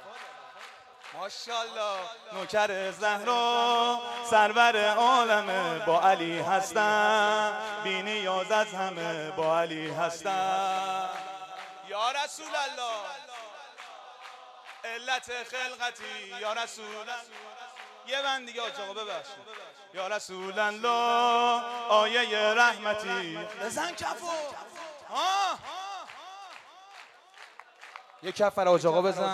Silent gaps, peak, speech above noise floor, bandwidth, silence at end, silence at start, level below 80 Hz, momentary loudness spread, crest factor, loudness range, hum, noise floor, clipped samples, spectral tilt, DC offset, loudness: none; -10 dBFS; 25 dB; 14.5 kHz; 0 s; 0 s; -78 dBFS; 22 LU; 20 dB; 11 LU; none; -53 dBFS; under 0.1%; -2.5 dB/octave; under 0.1%; -28 LUFS